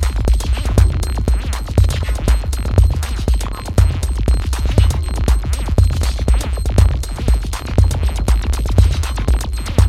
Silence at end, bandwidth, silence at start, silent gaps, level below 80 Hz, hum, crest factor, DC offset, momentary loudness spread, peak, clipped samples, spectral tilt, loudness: 0 s; 14.5 kHz; 0 s; none; -16 dBFS; none; 14 dB; under 0.1%; 4 LU; 0 dBFS; under 0.1%; -6 dB/octave; -17 LUFS